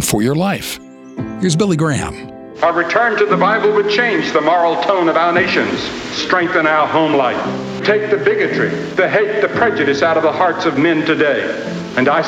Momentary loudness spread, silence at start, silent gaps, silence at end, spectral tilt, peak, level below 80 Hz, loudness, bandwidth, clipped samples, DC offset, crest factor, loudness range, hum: 8 LU; 0 s; none; 0 s; -5 dB/octave; -2 dBFS; -48 dBFS; -15 LUFS; 16 kHz; under 0.1%; under 0.1%; 14 dB; 2 LU; none